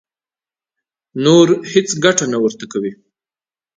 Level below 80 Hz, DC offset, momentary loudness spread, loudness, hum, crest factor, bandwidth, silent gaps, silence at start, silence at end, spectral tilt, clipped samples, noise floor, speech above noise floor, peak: -60 dBFS; under 0.1%; 13 LU; -14 LUFS; none; 18 dB; 9.6 kHz; none; 1.15 s; 0.85 s; -4.5 dB/octave; under 0.1%; under -90 dBFS; over 76 dB; 0 dBFS